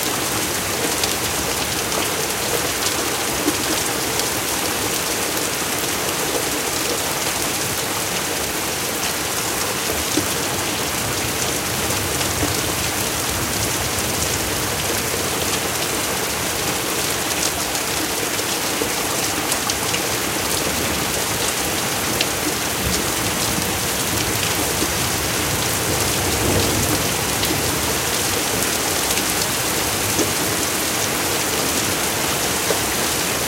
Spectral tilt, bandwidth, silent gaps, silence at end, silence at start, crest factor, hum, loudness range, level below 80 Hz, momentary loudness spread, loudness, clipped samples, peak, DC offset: -2 dB/octave; 17 kHz; none; 0 s; 0 s; 20 dB; none; 2 LU; -40 dBFS; 2 LU; -19 LUFS; under 0.1%; 0 dBFS; under 0.1%